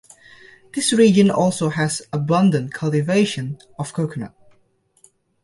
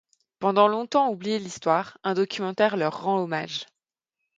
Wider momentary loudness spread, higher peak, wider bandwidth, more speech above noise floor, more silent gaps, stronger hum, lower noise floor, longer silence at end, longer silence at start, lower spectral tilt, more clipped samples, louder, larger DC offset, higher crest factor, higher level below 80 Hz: first, 16 LU vs 9 LU; about the same, -2 dBFS vs -4 dBFS; first, 11.5 kHz vs 9.2 kHz; second, 43 dB vs 62 dB; neither; neither; second, -61 dBFS vs -86 dBFS; first, 1.15 s vs 0.75 s; first, 0.75 s vs 0.4 s; about the same, -5.5 dB/octave vs -5 dB/octave; neither; first, -19 LUFS vs -25 LUFS; neither; about the same, 18 dB vs 22 dB; first, -58 dBFS vs -74 dBFS